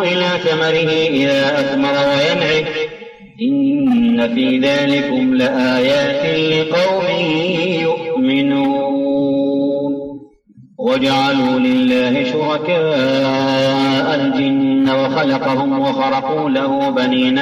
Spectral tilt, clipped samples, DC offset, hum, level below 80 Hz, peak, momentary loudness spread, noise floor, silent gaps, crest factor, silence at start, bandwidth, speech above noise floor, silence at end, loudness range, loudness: -6 dB/octave; under 0.1%; under 0.1%; none; -54 dBFS; -4 dBFS; 4 LU; -45 dBFS; none; 10 dB; 0 s; 7.8 kHz; 31 dB; 0 s; 2 LU; -15 LUFS